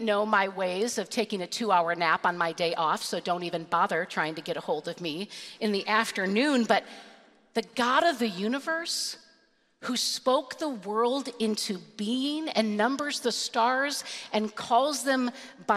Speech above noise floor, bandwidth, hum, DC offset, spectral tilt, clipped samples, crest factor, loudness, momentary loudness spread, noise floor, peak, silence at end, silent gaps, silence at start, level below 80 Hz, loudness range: 37 dB; 15 kHz; none; under 0.1%; -3 dB/octave; under 0.1%; 22 dB; -28 LUFS; 9 LU; -65 dBFS; -6 dBFS; 0 s; none; 0 s; -76 dBFS; 3 LU